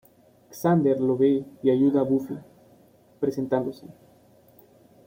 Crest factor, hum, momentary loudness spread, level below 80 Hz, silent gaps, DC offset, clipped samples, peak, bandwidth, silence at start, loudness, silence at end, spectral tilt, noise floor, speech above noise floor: 16 dB; none; 16 LU; -66 dBFS; none; under 0.1%; under 0.1%; -10 dBFS; 16.5 kHz; 0.5 s; -24 LUFS; 1.15 s; -8.5 dB/octave; -56 dBFS; 33 dB